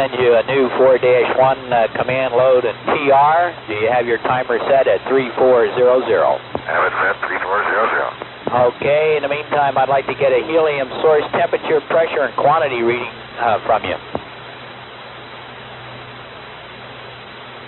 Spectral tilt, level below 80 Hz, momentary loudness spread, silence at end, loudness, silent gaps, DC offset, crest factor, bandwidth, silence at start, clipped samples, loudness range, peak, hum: -3 dB/octave; -54 dBFS; 20 LU; 0 s; -16 LUFS; none; under 0.1%; 14 dB; 4.2 kHz; 0 s; under 0.1%; 9 LU; -4 dBFS; none